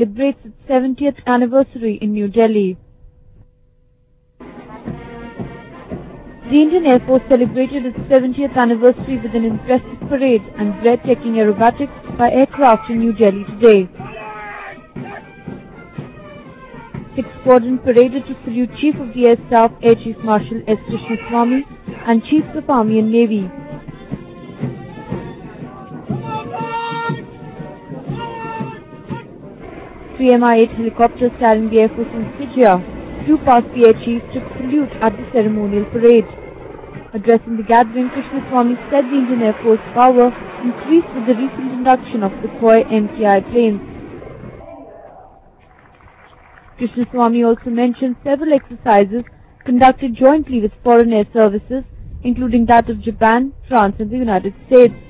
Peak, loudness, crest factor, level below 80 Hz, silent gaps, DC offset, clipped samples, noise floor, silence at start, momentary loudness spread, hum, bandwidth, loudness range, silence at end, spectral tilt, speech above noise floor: 0 dBFS; -15 LUFS; 16 dB; -42 dBFS; none; under 0.1%; under 0.1%; -54 dBFS; 0 s; 21 LU; none; 4 kHz; 12 LU; 0.1 s; -11 dB/octave; 40 dB